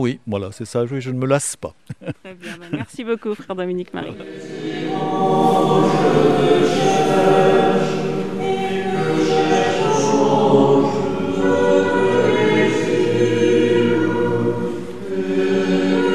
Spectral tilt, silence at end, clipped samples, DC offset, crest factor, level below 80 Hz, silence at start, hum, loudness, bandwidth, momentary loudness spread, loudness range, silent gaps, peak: -6 dB/octave; 0 s; under 0.1%; under 0.1%; 16 dB; -54 dBFS; 0 s; none; -17 LUFS; 13 kHz; 14 LU; 9 LU; none; 0 dBFS